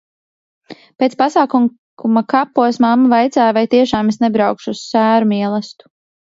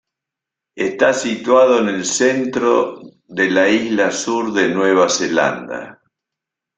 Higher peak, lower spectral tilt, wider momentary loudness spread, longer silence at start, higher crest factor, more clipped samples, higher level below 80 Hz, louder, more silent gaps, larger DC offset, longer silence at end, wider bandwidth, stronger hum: about the same, 0 dBFS vs -2 dBFS; first, -6 dB/octave vs -3.5 dB/octave; second, 7 LU vs 10 LU; about the same, 0.7 s vs 0.75 s; about the same, 14 dB vs 16 dB; neither; first, -54 dBFS vs -60 dBFS; about the same, -14 LUFS vs -16 LUFS; first, 1.78-1.97 s vs none; neither; second, 0.6 s vs 0.85 s; second, 7.8 kHz vs 9.4 kHz; neither